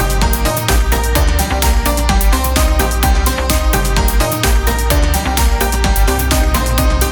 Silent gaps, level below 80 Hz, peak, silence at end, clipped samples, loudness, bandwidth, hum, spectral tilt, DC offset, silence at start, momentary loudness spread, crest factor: none; -14 dBFS; 0 dBFS; 0 s; under 0.1%; -14 LUFS; 19.5 kHz; none; -4 dB/octave; under 0.1%; 0 s; 1 LU; 12 dB